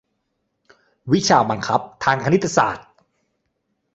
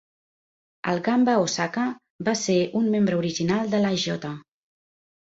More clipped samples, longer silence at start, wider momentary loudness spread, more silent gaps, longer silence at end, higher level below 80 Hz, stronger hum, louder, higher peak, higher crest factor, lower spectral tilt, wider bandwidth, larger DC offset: neither; first, 1.05 s vs 0.85 s; about the same, 7 LU vs 9 LU; second, none vs 2.10-2.19 s; first, 1.15 s vs 0.85 s; first, -56 dBFS vs -62 dBFS; neither; first, -19 LUFS vs -24 LUFS; first, 0 dBFS vs -8 dBFS; first, 22 dB vs 16 dB; about the same, -4.5 dB/octave vs -5 dB/octave; about the same, 8.2 kHz vs 8 kHz; neither